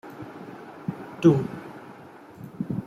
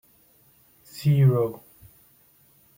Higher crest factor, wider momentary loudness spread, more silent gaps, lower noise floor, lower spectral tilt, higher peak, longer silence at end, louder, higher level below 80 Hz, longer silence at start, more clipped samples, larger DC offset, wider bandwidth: about the same, 22 dB vs 18 dB; about the same, 24 LU vs 24 LU; neither; second, -46 dBFS vs -59 dBFS; about the same, -8.5 dB/octave vs -8.5 dB/octave; first, -6 dBFS vs -10 dBFS; second, 0 s vs 1.2 s; second, -25 LUFS vs -22 LUFS; about the same, -62 dBFS vs -64 dBFS; second, 0.05 s vs 0.95 s; neither; neither; second, 11.5 kHz vs 16.5 kHz